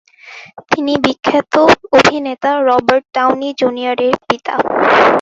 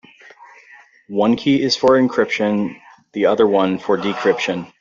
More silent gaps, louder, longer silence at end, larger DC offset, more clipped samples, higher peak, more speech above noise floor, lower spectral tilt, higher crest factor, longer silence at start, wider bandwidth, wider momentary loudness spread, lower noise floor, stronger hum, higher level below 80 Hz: neither; first, -13 LUFS vs -17 LUFS; second, 0 s vs 0.15 s; neither; neither; about the same, 0 dBFS vs -2 dBFS; second, 24 dB vs 30 dB; about the same, -4.5 dB/octave vs -5.5 dB/octave; about the same, 14 dB vs 16 dB; second, 0.25 s vs 1.1 s; about the same, 8 kHz vs 7.6 kHz; about the same, 8 LU vs 8 LU; second, -37 dBFS vs -47 dBFS; neither; first, -50 dBFS vs -58 dBFS